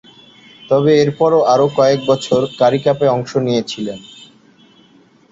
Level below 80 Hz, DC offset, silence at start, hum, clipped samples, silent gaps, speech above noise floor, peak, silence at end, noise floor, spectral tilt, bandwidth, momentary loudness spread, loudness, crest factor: -56 dBFS; under 0.1%; 0.7 s; none; under 0.1%; none; 35 dB; -2 dBFS; 1.3 s; -49 dBFS; -6 dB/octave; 8 kHz; 9 LU; -14 LUFS; 14 dB